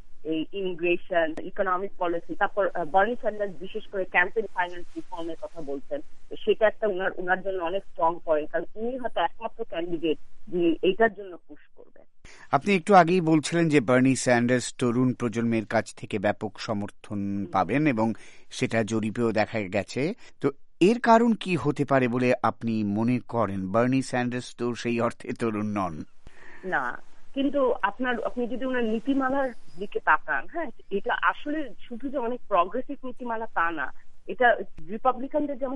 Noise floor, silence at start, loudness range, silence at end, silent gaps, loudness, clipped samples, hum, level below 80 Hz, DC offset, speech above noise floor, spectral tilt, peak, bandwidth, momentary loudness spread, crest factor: -45 dBFS; 0 s; 6 LU; 0 s; none; -26 LUFS; under 0.1%; none; -50 dBFS; under 0.1%; 20 dB; -6 dB/octave; -6 dBFS; 11.5 kHz; 12 LU; 20 dB